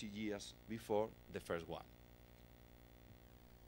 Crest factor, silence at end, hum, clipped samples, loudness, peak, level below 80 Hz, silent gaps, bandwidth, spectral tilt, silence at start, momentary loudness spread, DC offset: 22 dB; 0 s; 60 Hz at -65 dBFS; under 0.1%; -46 LUFS; -26 dBFS; -66 dBFS; none; 16 kHz; -5.5 dB/octave; 0 s; 22 LU; under 0.1%